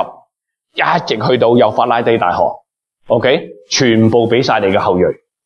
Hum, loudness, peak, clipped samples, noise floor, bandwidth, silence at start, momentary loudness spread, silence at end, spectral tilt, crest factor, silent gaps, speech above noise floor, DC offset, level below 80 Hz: none; -13 LUFS; 0 dBFS; under 0.1%; -69 dBFS; 7.2 kHz; 0 s; 7 LU; 0.3 s; -5 dB/octave; 14 dB; none; 57 dB; under 0.1%; -52 dBFS